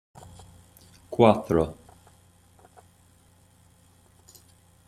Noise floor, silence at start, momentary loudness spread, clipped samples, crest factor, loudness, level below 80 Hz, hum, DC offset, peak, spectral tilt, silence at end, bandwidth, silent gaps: -59 dBFS; 1.1 s; 29 LU; under 0.1%; 26 dB; -23 LUFS; -56 dBFS; none; under 0.1%; -2 dBFS; -7 dB/octave; 3.15 s; 15 kHz; none